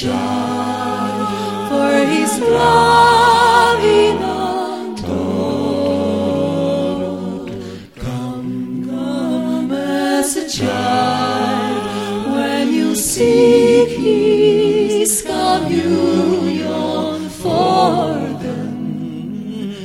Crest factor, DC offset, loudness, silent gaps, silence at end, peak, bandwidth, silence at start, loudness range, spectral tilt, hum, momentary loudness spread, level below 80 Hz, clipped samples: 14 dB; 0.2%; -16 LUFS; none; 0 s; 0 dBFS; 16.5 kHz; 0 s; 8 LU; -4.5 dB/octave; none; 13 LU; -44 dBFS; under 0.1%